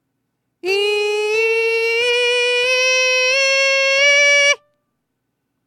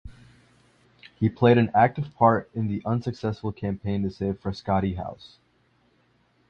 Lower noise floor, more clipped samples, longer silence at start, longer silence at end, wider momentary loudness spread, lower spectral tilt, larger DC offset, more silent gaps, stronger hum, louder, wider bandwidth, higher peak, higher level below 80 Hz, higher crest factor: first, -73 dBFS vs -65 dBFS; neither; first, 0.65 s vs 0.05 s; second, 1.1 s vs 1.35 s; second, 7 LU vs 11 LU; second, 1.5 dB/octave vs -9 dB/octave; neither; neither; second, none vs 60 Hz at -45 dBFS; first, -14 LUFS vs -25 LUFS; first, 15 kHz vs 6.8 kHz; about the same, -4 dBFS vs -6 dBFS; second, -74 dBFS vs -48 dBFS; second, 14 dB vs 20 dB